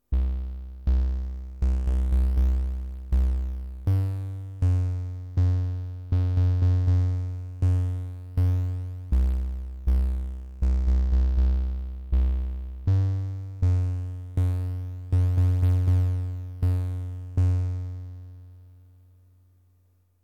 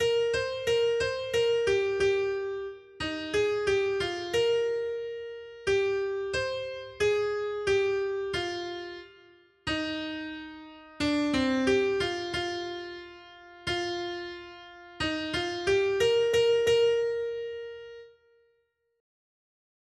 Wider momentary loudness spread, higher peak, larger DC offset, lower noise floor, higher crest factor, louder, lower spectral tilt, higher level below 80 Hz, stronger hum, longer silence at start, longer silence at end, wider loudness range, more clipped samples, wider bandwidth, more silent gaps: second, 11 LU vs 17 LU; about the same, -12 dBFS vs -14 dBFS; neither; second, -63 dBFS vs -74 dBFS; about the same, 12 dB vs 16 dB; about the same, -27 LUFS vs -29 LUFS; first, -9 dB/octave vs -4 dB/octave; first, -28 dBFS vs -56 dBFS; neither; about the same, 0.1 s vs 0 s; second, 1.55 s vs 1.9 s; second, 2 LU vs 6 LU; neither; second, 4.9 kHz vs 12.5 kHz; neither